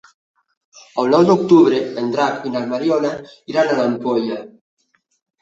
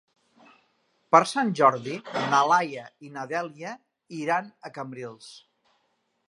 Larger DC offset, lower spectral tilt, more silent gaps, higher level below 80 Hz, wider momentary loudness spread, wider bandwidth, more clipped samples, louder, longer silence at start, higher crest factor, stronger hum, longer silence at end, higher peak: neither; first, -6.5 dB/octave vs -4.5 dB/octave; neither; first, -62 dBFS vs -80 dBFS; second, 12 LU vs 20 LU; second, 7.8 kHz vs 11.5 kHz; neither; first, -17 LUFS vs -24 LUFS; second, 0.75 s vs 1.1 s; second, 16 dB vs 26 dB; neither; about the same, 0.95 s vs 0.9 s; about the same, -2 dBFS vs -2 dBFS